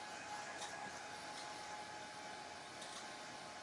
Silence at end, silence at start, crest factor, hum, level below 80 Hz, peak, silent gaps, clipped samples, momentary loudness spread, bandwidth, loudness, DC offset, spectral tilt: 0 s; 0 s; 16 dB; none; -84 dBFS; -34 dBFS; none; under 0.1%; 3 LU; 12 kHz; -49 LUFS; under 0.1%; -1.5 dB/octave